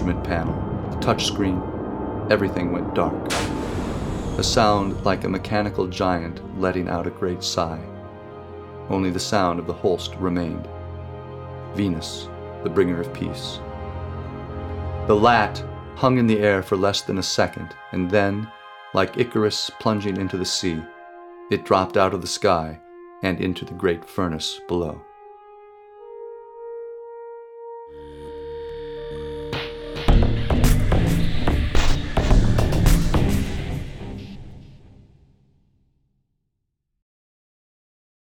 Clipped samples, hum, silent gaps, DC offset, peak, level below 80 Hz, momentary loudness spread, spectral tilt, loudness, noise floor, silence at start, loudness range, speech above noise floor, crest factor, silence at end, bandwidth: under 0.1%; none; none; under 0.1%; -4 dBFS; -30 dBFS; 18 LU; -5.5 dB/octave; -23 LUFS; -76 dBFS; 0 s; 11 LU; 54 dB; 20 dB; 3.5 s; 18 kHz